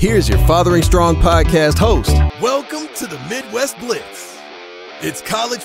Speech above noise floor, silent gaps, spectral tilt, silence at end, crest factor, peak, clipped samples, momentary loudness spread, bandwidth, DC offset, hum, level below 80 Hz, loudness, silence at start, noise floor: 20 dB; none; -5.5 dB/octave; 0 s; 14 dB; -2 dBFS; under 0.1%; 19 LU; 16 kHz; under 0.1%; none; -20 dBFS; -15 LUFS; 0 s; -34 dBFS